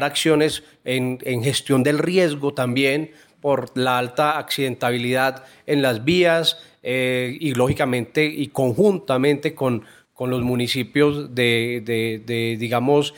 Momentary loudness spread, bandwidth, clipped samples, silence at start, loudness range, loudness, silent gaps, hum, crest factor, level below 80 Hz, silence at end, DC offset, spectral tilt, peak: 6 LU; 17 kHz; under 0.1%; 0 s; 2 LU; -21 LUFS; none; none; 16 dB; -54 dBFS; 0.05 s; under 0.1%; -5 dB/octave; -4 dBFS